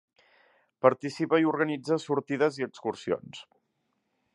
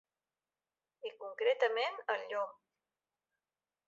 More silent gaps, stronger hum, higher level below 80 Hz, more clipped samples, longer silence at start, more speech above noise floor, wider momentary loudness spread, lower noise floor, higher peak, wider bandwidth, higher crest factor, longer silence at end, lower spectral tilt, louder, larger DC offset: neither; neither; first, -74 dBFS vs under -90 dBFS; neither; second, 0.85 s vs 1.05 s; second, 50 dB vs over 55 dB; second, 9 LU vs 15 LU; second, -77 dBFS vs under -90 dBFS; first, -4 dBFS vs -18 dBFS; first, 11.5 kHz vs 7.6 kHz; about the same, 24 dB vs 20 dB; second, 0.9 s vs 1.35 s; first, -6 dB/octave vs 3.5 dB/octave; first, -28 LUFS vs -36 LUFS; neither